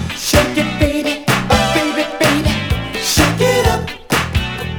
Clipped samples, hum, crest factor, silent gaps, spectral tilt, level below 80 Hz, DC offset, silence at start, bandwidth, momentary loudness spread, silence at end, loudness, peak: under 0.1%; none; 16 dB; none; -4 dB/octave; -26 dBFS; under 0.1%; 0 s; over 20 kHz; 5 LU; 0 s; -15 LUFS; 0 dBFS